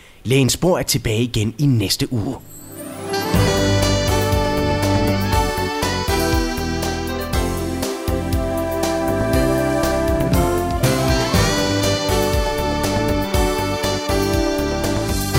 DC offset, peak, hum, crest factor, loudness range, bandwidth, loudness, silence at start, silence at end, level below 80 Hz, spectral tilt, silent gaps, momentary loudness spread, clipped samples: under 0.1%; -2 dBFS; none; 16 dB; 3 LU; 16.5 kHz; -19 LUFS; 0.25 s; 0 s; -28 dBFS; -5 dB/octave; none; 6 LU; under 0.1%